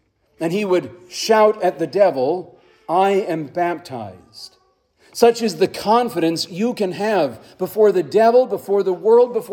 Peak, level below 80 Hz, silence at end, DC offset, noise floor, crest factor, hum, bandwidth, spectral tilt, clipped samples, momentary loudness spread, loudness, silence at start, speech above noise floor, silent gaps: 0 dBFS; -66 dBFS; 0 s; under 0.1%; -59 dBFS; 18 dB; none; 17.5 kHz; -5 dB/octave; under 0.1%; 14 LU; -18 LUFS; 0.4 s; 42 dB; none